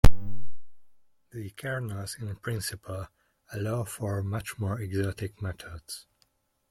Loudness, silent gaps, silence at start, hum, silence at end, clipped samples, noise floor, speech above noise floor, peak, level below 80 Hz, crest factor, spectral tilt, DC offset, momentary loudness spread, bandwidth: -34 LUFS; none; 0.05 s; none; 0.7 s; under 0.1%; -71 dBFS; 37 dB; -2 dBFS; -36 dBFS; 22 dB; -5.5 dB/octave; under 0.1%; 11 LU; 16.5 kHz